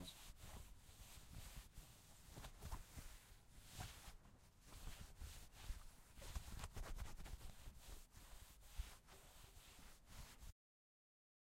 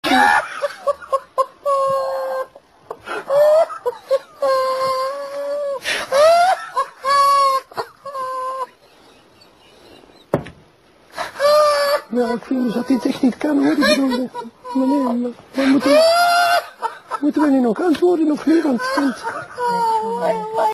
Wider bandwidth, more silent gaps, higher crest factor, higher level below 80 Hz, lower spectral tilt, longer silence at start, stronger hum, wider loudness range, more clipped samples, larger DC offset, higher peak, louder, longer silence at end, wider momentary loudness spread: first, 16 kHz vs 14.5 kHz; neither; first, 22 dB vs 16 dB; about the same, -58 dBFS vs -58 dBFS; about the same, -3.5 dB/octave vs -4 dB/octave; about the same, 0 s vs 0.05 s; neither; about the same, 4 LU vs 5 LU; neither; neither; second, -34 dBFS vs -2 dBFS; second, -60 LUFS vs -18 LUFS; first, 1 s vs 0 s; second, 9 LU vs 14 LU